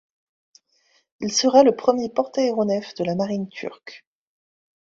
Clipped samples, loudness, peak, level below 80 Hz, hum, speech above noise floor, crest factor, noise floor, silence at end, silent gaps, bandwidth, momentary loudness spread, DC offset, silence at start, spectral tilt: under 0.1%; -21 LUFS; -2 dBFS; -66 dBFS; none; 43 dB; 20 dB; -64 dBFS; 0.9 s; none; 7.8 kHz; 18 LU; under 0.1%; 1.2 s; -4.5 dB/octave